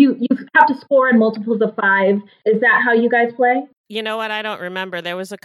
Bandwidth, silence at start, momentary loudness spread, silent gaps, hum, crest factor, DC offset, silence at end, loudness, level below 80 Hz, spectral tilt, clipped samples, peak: 12.5 kHz; 0 s; 11 LU; 3.77-3.84 s; none; 16 dB; under 0.1%; 0.1 s; -16 LUFS; -78 dBFS; -6 dB/octave; under 0.1%; 0 dBFS